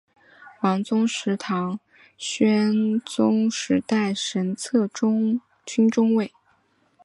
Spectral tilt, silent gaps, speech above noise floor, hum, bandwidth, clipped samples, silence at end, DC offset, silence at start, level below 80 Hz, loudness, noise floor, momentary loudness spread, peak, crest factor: -5 dB/octave; none; 42 dB; none; 11.5 kHz; under 0.1%; 0.75 s; under 0.1%; 0.4 s; -68 dBFS; -23 LUFS; -64 dBFS; 9 LU; -6 dBFS; 16 dB